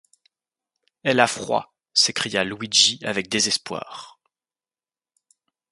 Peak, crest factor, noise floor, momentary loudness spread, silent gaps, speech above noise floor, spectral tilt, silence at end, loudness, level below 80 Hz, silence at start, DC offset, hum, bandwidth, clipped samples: -2 dBFS; 24 dB; under -90 dBFS; 15 LU; none; over 68 dB; -1.5 dB/octave; 1.6 s; -20 LUFS; -66 dBFS; 1.05 s; under 0.1%; none; 11.5 kHz; under 0.1%